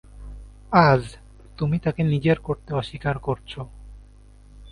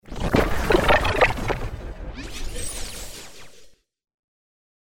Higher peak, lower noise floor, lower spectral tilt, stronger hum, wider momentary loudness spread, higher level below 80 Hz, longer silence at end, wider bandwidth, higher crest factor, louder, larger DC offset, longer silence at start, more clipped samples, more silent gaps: about the same, 0 dBFS vs -2 dBFS; about the same, -48 dBFS vs -50 dBFS; first, -8 dB/octave vs -4.5 dB/octave; neither; first, 22 LU vs 19 LU; second, -44 dBFS vs -32 dBFS; second, 0 s vs 1.25 s; second, 10.5 kHz vs 18 kHz; about the same, 24 dB vs 22 dB; about the same, -22 LUFS vs -22 LUFS; neither; about the same, 0.15 s vs 0.05 s; neither; neither